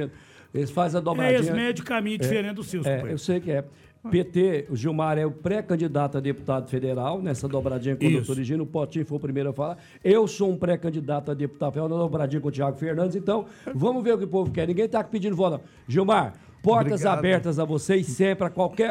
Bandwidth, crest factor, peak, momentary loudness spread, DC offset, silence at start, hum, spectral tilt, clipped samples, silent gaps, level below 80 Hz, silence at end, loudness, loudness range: 16 kHz; 16 dB; -8 dBFS; 7 LU; under 0.1%; 0 s; none; -7 dB/octave; under 0.1%; none; -58 dBFS; 0 s; -25 LUFS; 3 LU